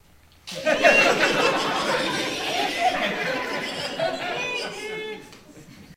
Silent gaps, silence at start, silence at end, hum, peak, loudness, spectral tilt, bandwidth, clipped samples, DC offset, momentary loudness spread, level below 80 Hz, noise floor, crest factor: none; 0.45 s; 0 s; none; -2 dBFS; -22 LUFS; -2.5 dB/octave; 16 kHz; under 0.1%; under 0.1%; 15 LU; -56 dBFS; -46 dBFS; 22 dB